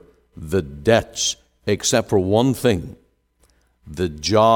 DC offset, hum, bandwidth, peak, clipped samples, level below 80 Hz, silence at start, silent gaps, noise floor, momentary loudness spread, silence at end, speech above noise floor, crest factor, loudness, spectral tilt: under 0.1%; none; 18 kHz; -2 dBFS; under 0.1%; -44 dBFS; 0.35 s; none; -61 dBFS; 11 LU; 0 s; 42 dB; 18 dB; -20 LUFS; -4.5 dB/octave